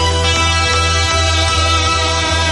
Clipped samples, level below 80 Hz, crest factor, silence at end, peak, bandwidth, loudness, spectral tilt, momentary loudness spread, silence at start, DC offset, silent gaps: under 0.1%; -22 dBFS; 12 dB; 0 s; -2 dBFS; 11.5 kHz; -13 LUFS; -3 dB/octave; 1 LU; 0 s; under 0.1%; none